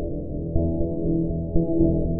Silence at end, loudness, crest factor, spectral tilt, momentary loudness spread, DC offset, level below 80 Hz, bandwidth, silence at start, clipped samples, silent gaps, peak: 0 s; -25 LUFS; 16 dB; -18.5 dB/octave; 7 LU; under 0.1%; -32 dBFS; 1.1 kHz; 0 s; under 0.1%; none; -6 dBFS